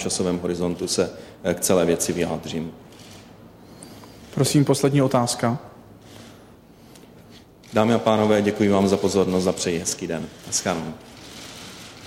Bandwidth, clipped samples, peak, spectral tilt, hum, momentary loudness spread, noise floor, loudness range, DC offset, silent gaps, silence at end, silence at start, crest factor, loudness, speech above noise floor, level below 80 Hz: 16 kHz; under 0.1%; -6 dBFS; -5 dB/octave; none; 22 LU; -48 dBFS; 4 LU; under 0.1%; none; 0 s; 0 s; 18 dB; -22 LUFS; 27 dB; -54 dBFS